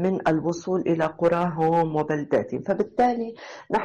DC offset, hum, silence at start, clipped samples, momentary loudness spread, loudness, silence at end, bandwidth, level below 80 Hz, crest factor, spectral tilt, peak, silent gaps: under 0.1%; none; 0 s; under 0.1%; 6 LU; -24 LUFS; 0 s; 9.2 kHz; -58 dBFS; 12 dB; -7.5 dB/octave; -12 dBFS; none